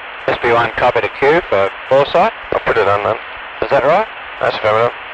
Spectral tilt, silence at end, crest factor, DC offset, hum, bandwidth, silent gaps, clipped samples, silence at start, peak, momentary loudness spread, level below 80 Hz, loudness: -6 dB/octave; 0 s; 12 dB; under 0.1%; none; 8.6 kHz; none; under 0.1%; 0 s; -2 dBFS; 7 LU; -44 dBFS; -15 LUFS